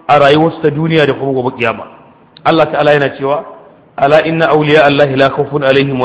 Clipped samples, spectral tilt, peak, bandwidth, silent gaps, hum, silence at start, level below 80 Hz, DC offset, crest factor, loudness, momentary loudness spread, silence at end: 0.3%; -7 dB/octave; 0 dBFS; 8.6 kHz; none; none; 0.1 s; -48 dBFS; under 0.1%; 10 dB; -11 LUFS; 9 LU; 0 s